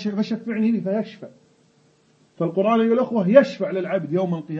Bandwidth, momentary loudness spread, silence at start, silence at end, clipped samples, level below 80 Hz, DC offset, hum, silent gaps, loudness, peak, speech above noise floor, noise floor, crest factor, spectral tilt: 7.2 kHz; 11 LU; 0 s; 0 s; under 0.1%; -70 dBFS; under 0.1%; none; none; -21 LUFS; 0 dBFS; 39 dB; -59 dBFS; 20 dB; -8 dB/octave